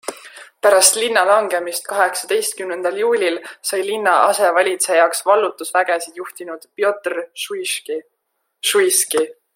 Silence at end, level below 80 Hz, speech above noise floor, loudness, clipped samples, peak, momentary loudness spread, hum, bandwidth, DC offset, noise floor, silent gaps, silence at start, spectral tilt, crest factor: 0.25 s; -72 dBFS; 52 dB; -17 LUFS; under 0.1%; 0 dBFS; 13 LU; none; 16.5 kHz; under 0.1%; -70 dBFS; none; 0.05 s; 0 dB/octave; 18 dB